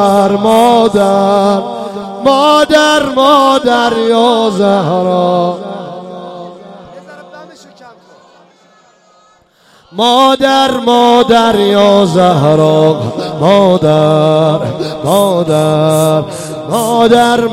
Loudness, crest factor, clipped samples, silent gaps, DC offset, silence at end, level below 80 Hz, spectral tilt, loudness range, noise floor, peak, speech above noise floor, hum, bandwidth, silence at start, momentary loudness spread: -9 LUFS; 10 dB; under 0.1%; none; under 0.1%; 0 s; -46 dBFS; -5.5 dB/octave; 8 LU; -48 dBFS; 0 dBFS; 39 dB; none; 16.5 kHz; 0 s; 14 LU